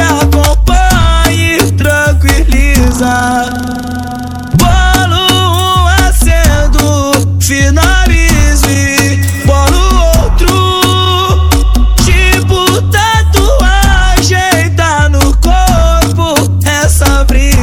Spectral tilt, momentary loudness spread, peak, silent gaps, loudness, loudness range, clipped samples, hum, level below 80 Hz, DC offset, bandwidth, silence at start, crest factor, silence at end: -4.5 dB/octave; 2 LU; 0 dBFS; none; -8 LUFS; 2 LU; 2%; none; -10 dBFS; under 0.1%; 18.5 kHz; 0 s; 8 dB; 0 s